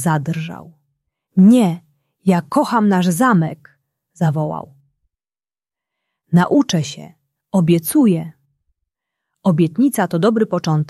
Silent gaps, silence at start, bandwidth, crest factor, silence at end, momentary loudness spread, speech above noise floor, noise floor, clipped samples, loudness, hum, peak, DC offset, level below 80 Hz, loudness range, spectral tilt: none; 0 s; 14 kHz; 16 dB; 0.05 s; 12 LU; over 75 dB; under -90 dBFS; under 0.1%; -16 LUFS; none; -2 dBFS; under 0.1%; -60 dBFS; 5 LU; -6.5 dB/octave